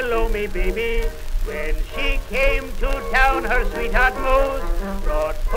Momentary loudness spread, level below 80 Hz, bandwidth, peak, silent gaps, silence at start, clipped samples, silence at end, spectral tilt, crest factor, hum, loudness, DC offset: 10 LU; -22 dBFS; 16 kHz; -2 dBFS; none; 0 s; under 0.1%; 0 s; -5 dB/octave; 18 dB; none; -22 LUFS; under 0.1%